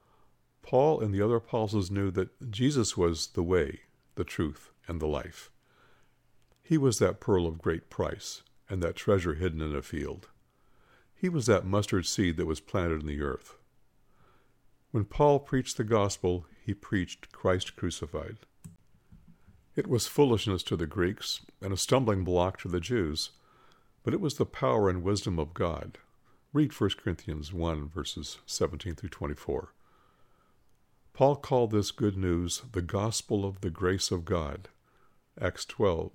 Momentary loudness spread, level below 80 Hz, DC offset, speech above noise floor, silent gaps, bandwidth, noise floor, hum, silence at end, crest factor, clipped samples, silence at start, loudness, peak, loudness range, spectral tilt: 12 LU; -52 dBFS; under 0.1%; 35 dB; none; 16 kHz; -65 dBFS; none; 0.05 s; 22 dB; under 0.1%; 0.65 s; -30 LUFS; -10 dBFS; 5 LU; -5.5 dB/octave